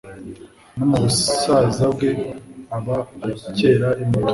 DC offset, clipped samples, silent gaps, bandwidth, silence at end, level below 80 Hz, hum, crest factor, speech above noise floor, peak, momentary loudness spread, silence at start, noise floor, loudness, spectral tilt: under 0.1%; under 0.1%; none; 11.5 kHz; 0 s; -46 dBFS; none; 16 dB; 20 dB; -4 dBFS; 19 LU; 0.05 s; -39 dBFS; -19 LUFS; -5.5 dB/octave